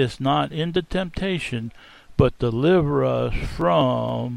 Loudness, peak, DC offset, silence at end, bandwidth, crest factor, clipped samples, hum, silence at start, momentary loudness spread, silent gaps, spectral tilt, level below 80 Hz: -22 LUFS; -2 dBFS; under 0.1%; 0 s; 12 kHz; 20 dB; under 0.1%; none; 0 s; 9 LU; none; -7.5 dB/octave; -36 dBFS